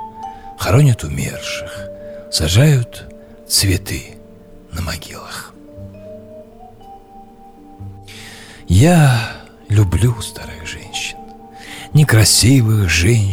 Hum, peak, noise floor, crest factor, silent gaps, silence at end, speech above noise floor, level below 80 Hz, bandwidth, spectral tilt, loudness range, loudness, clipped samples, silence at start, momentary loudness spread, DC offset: none; -2 dBFS; -40 dBFS; 14 dB; none; 0 s; 26 dB; -34 dBFS; 17 kHz; -4.5 dB/octave; 16 LU; -15 LUFS; under 0.1%; 0 s; 25 LU; under 0.1%